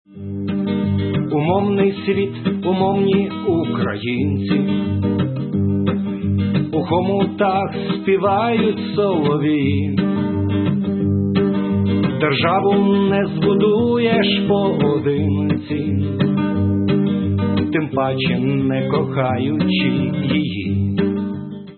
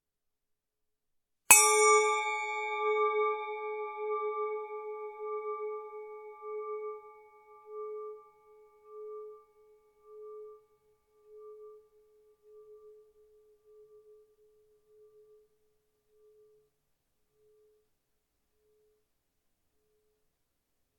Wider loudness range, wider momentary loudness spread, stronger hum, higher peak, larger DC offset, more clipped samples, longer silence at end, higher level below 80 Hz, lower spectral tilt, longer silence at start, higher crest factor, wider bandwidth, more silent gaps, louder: second, 3 LU vs 28 LU; second, 5 LU vs 27 LU; neither; about the same, -4 dBFS vs -2 dBFS; neither; neither; second, 0.05 s vs 8.05 s; first, -52 dBFS vs -80 dBFS; first, -12.5 dB/octave vs 1.5 dB/octave; second, 0.1 s vs 1.5 s; second, 14 dB vs 34 dB; second, 4.4 kHz vs 18 kHz; neither; first, -18 LUFS vs -28 LUFS